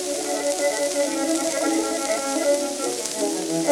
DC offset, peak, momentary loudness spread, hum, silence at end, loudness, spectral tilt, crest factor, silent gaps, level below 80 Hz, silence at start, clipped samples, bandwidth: under 0.1%; -4 dBFS; 3 LU; none; 0 s; -23 LUFS; -2 dB/octave; 20 dB; none; -64 dBFS; 0 s; under 0.1%; 19 kHz